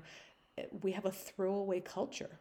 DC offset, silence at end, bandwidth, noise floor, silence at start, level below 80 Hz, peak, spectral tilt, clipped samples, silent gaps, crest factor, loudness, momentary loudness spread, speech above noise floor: under 0.1%; 0 s; 19 kHz; -59 dBFS; 0 s; -76 dBFS; -20 dBFS; -5.5 dB/octave; under 0.1%; none; 18 dB; -39 LUFS; 15 LU; 21 dB